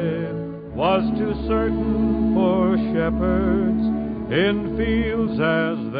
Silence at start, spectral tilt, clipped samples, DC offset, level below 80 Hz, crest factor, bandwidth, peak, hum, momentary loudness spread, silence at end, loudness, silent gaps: 0 s; -12 dB/octave; under 0.1%; under 0.1%; -34 dBFS; 14 dB; 4.9 kHz; -6 dBFS; none; 5 LU; 0 s; -21 LUFS; none